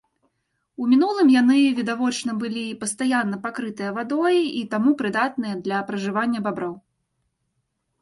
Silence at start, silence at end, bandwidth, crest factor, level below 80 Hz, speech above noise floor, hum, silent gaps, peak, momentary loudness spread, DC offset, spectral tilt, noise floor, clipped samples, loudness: 0.8 s; 1.25 s; 11.5 kHz; 14 dB; -68 dBFS; 53 dB; none; none; -8 dBFS; 12 LU; under 0.1%; -4.5 dB/octave; -74 dBFS; under 0.1%; -22 LUFS